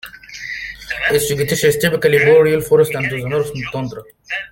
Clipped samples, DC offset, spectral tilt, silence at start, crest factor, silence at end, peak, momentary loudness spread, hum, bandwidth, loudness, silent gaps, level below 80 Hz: under 0.1%; under 0.1%; -4.5 dB/octave; 0.05 s; 16 dB; 0.05 s; 0 dBFS; 16 LU; none; 17 kHz; -16 LUFS; none; -46 dBFS